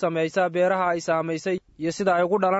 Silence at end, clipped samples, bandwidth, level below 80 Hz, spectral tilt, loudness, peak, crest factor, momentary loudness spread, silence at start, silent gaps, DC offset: 0 s; under 0.1%; 8 kHz; -64 dBFS; -5.5 dB/octave; -24 LUFS; -10 dBFS; 14 dB; 7 LU; 0 s; none; under 0.1%